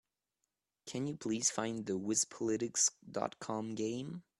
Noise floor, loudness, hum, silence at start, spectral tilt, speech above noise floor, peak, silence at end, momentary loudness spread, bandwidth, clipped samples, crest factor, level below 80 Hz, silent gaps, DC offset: -87 dBFS; -36 LUFS; none; 0.85 s; -3 dB/octave; 50 dB; -16 dBFS; 0.2 s; 9 LU; 13 kHz; under 0.1%; 22 dB; -76 dBFS; none; under 0.1%